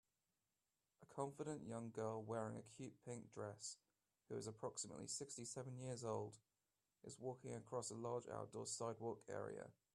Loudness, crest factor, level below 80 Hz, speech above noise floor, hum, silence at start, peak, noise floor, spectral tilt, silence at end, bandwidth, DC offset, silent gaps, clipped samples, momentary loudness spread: -51 LUFS; 20 dB; -86 dBFS; over 39 dB; none; 1 s; -32 dBFS; under -90 dBFS; -4.5 dB/octave; 0.2 s; 13 kHz; under 0.1%; none; under 0.1%; 8 LU